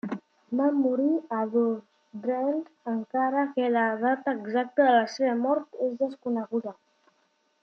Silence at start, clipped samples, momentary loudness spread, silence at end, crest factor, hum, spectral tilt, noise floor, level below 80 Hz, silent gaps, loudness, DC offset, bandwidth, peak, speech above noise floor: 0.05 s; under 0.1%; 10 LU; 0.9 s; 18 dB; none; -6 dB/octave; -70 dBFS; -84 dBFS; none; -27 LUFS; under 0.1%; 6.6 kHz; -10 dBFS; 44 dB